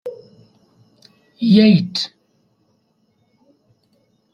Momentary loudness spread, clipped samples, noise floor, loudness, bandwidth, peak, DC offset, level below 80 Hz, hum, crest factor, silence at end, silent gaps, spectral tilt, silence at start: 16 LU; under 0.1%; -63 dBFS; -15 LUFS; 7.2 kHz; -2 dBFS; under 0.1%; -62 dBFS; none; 18 dB; 2.25 s; none; -7 dB/octave; 0.05 s